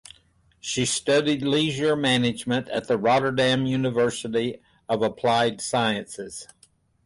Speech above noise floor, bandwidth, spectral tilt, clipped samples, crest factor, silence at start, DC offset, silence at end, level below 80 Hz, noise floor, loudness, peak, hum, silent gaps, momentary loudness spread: 37 dB; 11.5 kHz; -4.5 dB/octave; under 0.1%; 14 dB; 0.65 s; under 0.1%; 0.6 s; -58 dBFS; -61 dBFS; -23 LUFS; -10 dBFS; none; none; 10 LU